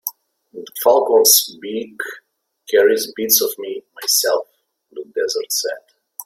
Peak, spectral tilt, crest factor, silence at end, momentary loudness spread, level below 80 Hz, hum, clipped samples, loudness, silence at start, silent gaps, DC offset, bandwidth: 0 dBFS; 0 dB/octave; 20 dB; 0.05 s; 20 LU; -70 dBFS; none; under 0.1%; -16 LUFS; 0.05 s; none; under 0.1%; 16.5 kHz